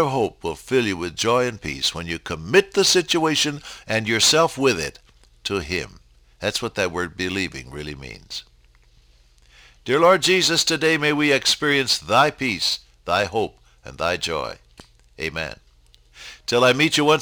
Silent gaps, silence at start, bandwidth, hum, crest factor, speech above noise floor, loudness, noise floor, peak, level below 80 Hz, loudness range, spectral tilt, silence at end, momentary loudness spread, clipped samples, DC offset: none; 0 s; over 20 kHz; none; 18 dB; 33 dB; -20 LUFS; -54 dBFS; -4 dBFS; -50 dBFS; 10 LU; -3 dB/octave; 0 s; 17 LU; under 0.1%; under 0.1%